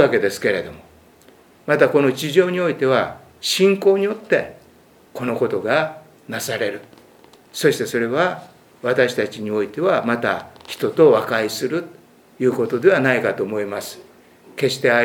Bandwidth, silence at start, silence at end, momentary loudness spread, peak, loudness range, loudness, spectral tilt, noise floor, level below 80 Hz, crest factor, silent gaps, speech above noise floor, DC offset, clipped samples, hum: 18.5 kHz; 0 s; 0 s; 15 LU; 0 dBFS; 5 LU; -19 LUFS; -4.5 dB/octave; -51 dBFS; -64 dBFS; 20 dB; none; 32 dB; under 0.1%; under 0.1%; none